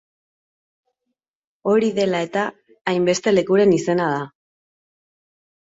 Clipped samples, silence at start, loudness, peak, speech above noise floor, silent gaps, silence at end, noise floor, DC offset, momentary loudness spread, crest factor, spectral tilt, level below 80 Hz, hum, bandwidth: under 0.1%; 1.65 s; -20 LUFS; -4 dBFS; 61 dB; 2.81-2.85 s; 1.5 s; -79 dBFS; under 0.1%; 12 LU; 18 dB; -5.5 dB/octave; -64 dBFS; none; 8 kHz